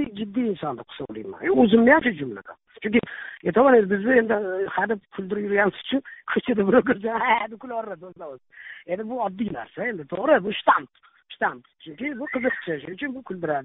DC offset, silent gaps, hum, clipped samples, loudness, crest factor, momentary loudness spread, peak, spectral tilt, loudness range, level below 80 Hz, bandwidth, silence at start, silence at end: under 0.1%; none; none; under 0.1%; -23 LUFS; 22 dB; 17 LU; -2 dBFS; -4 dB/octave; 6 LU; -60 dBFS; 4 kHz; 0 s; 0 s